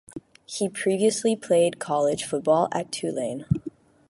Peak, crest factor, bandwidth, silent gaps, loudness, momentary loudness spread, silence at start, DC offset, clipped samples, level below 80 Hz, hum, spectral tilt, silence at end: -8 dBFS; 16 dB; 11.5 kHz; none; -25 LUFS; 11 LU; 0.15 s; under 0.1%; under 0.1%; -54 dBFS; none; -5 dB/octave; 0.4 s